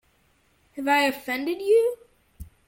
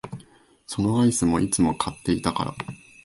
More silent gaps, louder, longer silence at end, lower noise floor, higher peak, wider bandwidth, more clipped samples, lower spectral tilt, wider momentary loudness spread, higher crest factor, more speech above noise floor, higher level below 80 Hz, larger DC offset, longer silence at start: neither; about the same, -23 LUFS vs -23 LUFS; about the same, 0.2 s vs 0.3 s; first, -64 dBFS vs -53 dBFS; about the same, -8 dBFS vs -6 dBFS; first, 16.5 kHz vs 11.5 kHz; neither; second, -3.5 dB/octave vs -5 dB/octave; about the same, 16 LU vs 16 LU; about the same, 18 dB vs 18 dB; first, 42 dB vs 31 dB; second, -56 dBFS vs -46 dBFS; neither; first, 0.75 s vs 0.05 s